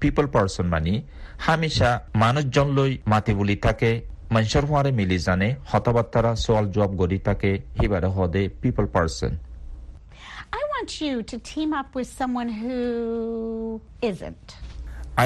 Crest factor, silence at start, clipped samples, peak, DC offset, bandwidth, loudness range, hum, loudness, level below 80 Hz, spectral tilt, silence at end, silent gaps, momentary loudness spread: 18 dB; 0 s; under 0.1%; -4 dBFS; under 0.1%; 12 kHz; 7 LU; none; -24 LUFS; -36 dBFS; -6.5 dB/octave; 0 s; none; 15 LU